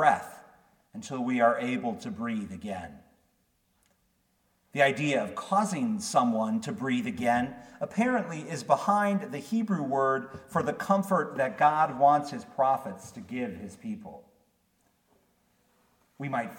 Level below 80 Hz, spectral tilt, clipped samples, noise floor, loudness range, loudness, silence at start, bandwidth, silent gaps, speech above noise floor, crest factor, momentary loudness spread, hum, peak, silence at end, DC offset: -68 dBFS; -5.5 dB/octave; under 0.1%; -72 dBFS; 8 LU; -28 LUFS; 0 s; 17.5 kHz; none; 44 dB; 22 dB; 15 LU; none; -8 dBFS; 0 s; under 0.1%